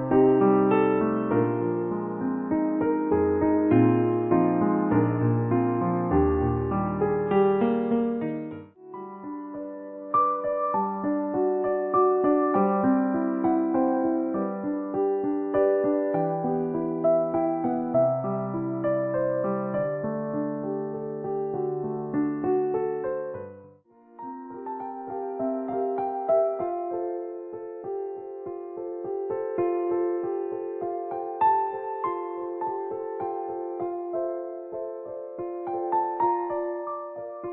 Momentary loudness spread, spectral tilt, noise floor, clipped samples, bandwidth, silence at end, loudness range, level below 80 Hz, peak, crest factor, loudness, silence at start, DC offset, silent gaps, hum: 13 LU; -13 dB/octave; -54 dBFS; under 0.1%; 3.8 kHz; 0 s; 8 LU; -50 dBFS; -8 dBFS; 16 dB; -26 LUFS; 0 s; under 0.1%; none; none